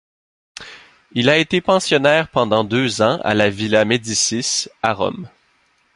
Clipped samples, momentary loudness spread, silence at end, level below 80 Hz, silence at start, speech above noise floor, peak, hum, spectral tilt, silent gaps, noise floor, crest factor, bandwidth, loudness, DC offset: under 0.1%; 14 LU; 0.7 s; -52 dBFS; 0.6 s; 43 dB; 0 dBFS; none; -3.5 dB/octave; none; -60 dBFS; 18 dB; 11.5 kHz; -17 LUFS; under 0.1%